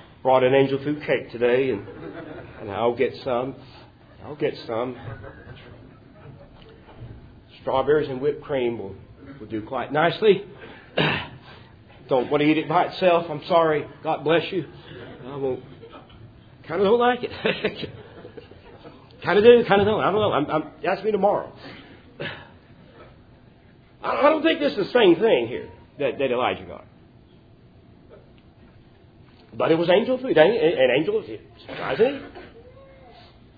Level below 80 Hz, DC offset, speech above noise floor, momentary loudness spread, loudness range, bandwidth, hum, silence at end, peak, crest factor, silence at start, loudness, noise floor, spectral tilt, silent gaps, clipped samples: -56 dBFS; under 0.1%; 30 dB; 23 LU; 9 LU; 5 kHz; none; 0.95 s; -2 dBFS; 22 dB; 0.25 s; -22 LUFS; -52 dBFS; -8.5 dB/octave; none; under 0.1%